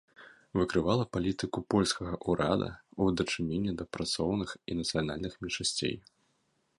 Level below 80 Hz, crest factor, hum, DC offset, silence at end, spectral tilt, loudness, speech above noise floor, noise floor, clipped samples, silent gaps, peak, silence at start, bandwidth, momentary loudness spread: -52 dBFS; 20 dB; none; under 0.1%; 0.8 s; -5 dB/octave; -32 LUFS; 43 dB; -75 dBFS; under 0.1%; none; -12 dBFS; 0.2 s; 11.5 kHz; 7 LU